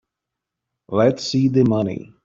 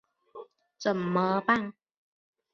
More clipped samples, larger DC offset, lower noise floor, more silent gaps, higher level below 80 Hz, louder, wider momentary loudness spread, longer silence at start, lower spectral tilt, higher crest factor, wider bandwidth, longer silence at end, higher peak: neither; neither; first, -83 dBFS vs -49 dBFS; neither; first, -56 dBFS vs -70 dBFS; first, -19 LUFS vs -28 LUFS; second, 8 LU vs 23 LU; first, 0.9 s vs 0.35 s; about the same, -7 dB/octave vs -6.5 dB/octave; second, 16 dB vs 22 dB; about the same, 7.6 kHz vs 7.2 kHz; second, 0.25 s vs 0.85 s; first, -4 dBFS vs -10 dBFS